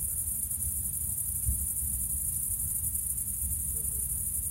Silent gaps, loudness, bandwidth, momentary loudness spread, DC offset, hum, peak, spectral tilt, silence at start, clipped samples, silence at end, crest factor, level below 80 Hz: none; -29 LUFS; 16 kHz; 1 LU; under 0.1%; none; -16 dBFS; -3 dB/octave; 0 s; under 0.1%; 0 s; 16 dB; -42 dBFS